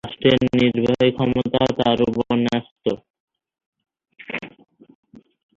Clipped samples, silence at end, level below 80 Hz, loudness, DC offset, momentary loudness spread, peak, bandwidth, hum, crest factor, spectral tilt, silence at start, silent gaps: under 0.1%; 1.1 s; -50 dBFS; -20 LUFS; under 0.1%; 14 LU; -2 dBFS; 7.4 kHz; none; 18 dB; -7 dB/octave; 0.05 s; 2.71-2.76 s, 3.10-3.14 s, 3.20-3.28 s, 3.66-3.73 s